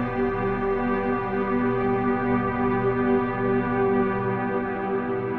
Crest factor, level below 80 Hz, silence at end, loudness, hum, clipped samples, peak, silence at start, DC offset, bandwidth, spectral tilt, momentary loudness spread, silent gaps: 14 dB; -44 dBFS; 0 s; -24 LUFS; none; under 0.1%; -10 dBFS; 0 s; under 0.1%; 4.5 kHz; -10 dB/octave; 4 LU; none